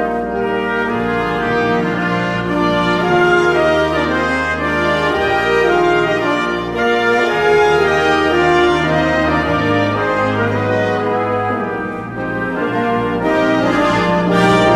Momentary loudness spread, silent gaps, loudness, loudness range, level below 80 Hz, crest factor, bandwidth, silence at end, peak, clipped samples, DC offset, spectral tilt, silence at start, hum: 6 LU; none; -15 LUFS; 4 LU; -38 dBFS; 14 dB; 14 kHz; 0 s; -2 dBFS; under 0.1%; under 0.1%; -6 dB/octave; 0 s; none